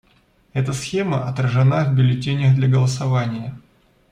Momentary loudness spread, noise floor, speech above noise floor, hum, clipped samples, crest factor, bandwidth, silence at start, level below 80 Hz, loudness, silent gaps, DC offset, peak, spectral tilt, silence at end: 10 LU; -57 dBFS; 40 dB; none; under 0.1%; 12 dB; 10.5 kHz; 0.55 s; -52 dBFS; -19 LUFS; none; under 0.1%; -6 dBFS; -7 dB/octave; 0.55 s